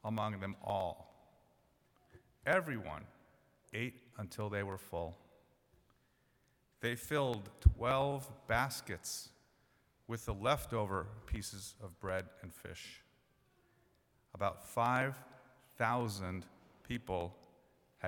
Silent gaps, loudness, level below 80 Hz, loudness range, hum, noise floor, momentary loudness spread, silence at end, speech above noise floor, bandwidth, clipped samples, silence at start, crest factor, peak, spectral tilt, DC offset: none; -39 LUFS; -48 dBFS; 9 LU; none; -75 dBFS; 16 LU; 0 s; 37 dB; 19 kHz; under 0.1%; 0.05 s; 28 dB; -12 dBFS; -5 dB/octave; under 0.1%